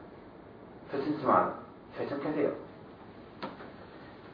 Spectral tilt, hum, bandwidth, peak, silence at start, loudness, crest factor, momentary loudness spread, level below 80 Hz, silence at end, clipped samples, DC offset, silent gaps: -5.5 dB/octave; none; 5.2 kHz; -10 dBFS; 0 s; -32 LUFS; 24 dB; 23 LU; -66 dBFS; 0 s; under 0.1%; under 0.1%; none